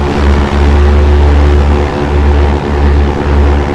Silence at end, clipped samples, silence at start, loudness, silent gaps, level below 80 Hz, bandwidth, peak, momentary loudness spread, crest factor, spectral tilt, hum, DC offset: 0 s; 0.7%; 0 s; -9 LUFS; none; -8 dBFS; 7.4 kHz; 0 dBFS; 3 LU; 8 dB; -7.5 dB/octave; none; 2%